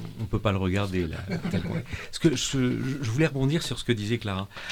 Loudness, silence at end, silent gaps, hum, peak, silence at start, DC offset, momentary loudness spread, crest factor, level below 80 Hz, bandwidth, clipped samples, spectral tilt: -28 LUFS; 0 s; none; none; -8 dBFS; 0 s; under 0.1%; 8 LU; 18 dB; -44 dBFS; 18 kHz; under 0.1%; -5.5 dB/octave